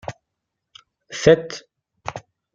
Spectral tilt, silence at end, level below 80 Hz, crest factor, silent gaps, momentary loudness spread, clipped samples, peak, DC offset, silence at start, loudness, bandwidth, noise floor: -5 dB/octave; 0.35 s; -52 dBFS; 22 dB; none; 20 LU; under 0.1%; -2 dBFS; under 0.1%; 0.05 s; -17 LUFS; 7.8 kHz; -80 dBFS